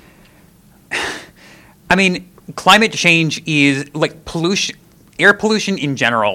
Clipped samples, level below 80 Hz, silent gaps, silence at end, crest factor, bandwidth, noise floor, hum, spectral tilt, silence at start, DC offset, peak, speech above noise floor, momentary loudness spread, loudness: 0.1%; -48 dBFS; none; 0 s; 16 dB; 17.5 kHz; -48 dBFS; none; -4 dB/octave; 0.9 s; under 0.1%; 0 dBFS; 33 dB; 13 LU; -14 LUFS